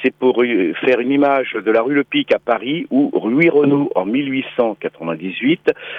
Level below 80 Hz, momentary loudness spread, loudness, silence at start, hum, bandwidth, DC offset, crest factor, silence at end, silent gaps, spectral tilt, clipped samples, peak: -62 dBFS; 6 LU; -17 LUFS; 0 s; none; 5.2 kHz; under 0.1%; 14 dB; 0 s; none; -8 dB/octave; under 0.1%; -2 dBFS